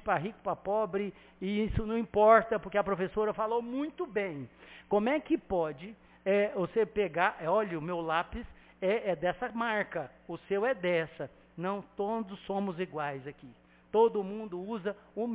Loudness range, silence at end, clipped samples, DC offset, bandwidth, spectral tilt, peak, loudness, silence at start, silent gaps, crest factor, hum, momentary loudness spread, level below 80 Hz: 5 LU; 0 s; under 0.1%; under 0.1%; 4 kHz; -4.5 dB/octave; -10 dBFS; -32 LUFS; 0.05 s; none; 22 dB; none; 12 LU; -54 dBFS